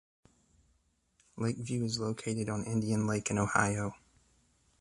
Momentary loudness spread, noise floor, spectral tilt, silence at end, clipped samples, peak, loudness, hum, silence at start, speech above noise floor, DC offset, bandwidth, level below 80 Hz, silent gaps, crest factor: 8 LU; -73 dBFS; -5 dB/octave; 0.85 s; under 0.1%; -12 dBFS; -33 LUFS; none; 1.35 s; 41 dB; under 0.1%; 11.5 kHz; -60 dBFS; none; 24 dB